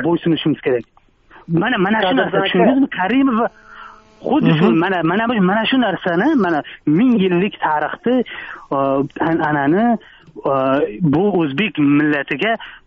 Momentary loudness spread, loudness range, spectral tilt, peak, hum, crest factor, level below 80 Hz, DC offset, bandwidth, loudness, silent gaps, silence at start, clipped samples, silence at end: 6 LU; 2 LU; -4.5 dB/octave; -2 dBFS; none; 16 dB; -52 dBFS; under 0.1%; 5.8 kHz; -16 LUFS; none; 0 s; under 0.1%; 0.1 s